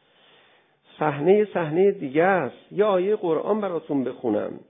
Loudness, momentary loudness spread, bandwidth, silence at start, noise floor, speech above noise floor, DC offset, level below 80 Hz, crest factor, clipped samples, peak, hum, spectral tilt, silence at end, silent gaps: -23 LUFS; 7 LU; 3.8 kHz; 1 s; -59 dBFS; 37 dB; under 0.1%; -72 dBFS; 18 dB; under 0.1%; -6 dBFS; none; -11.5 dB/octave; 0.1 s; none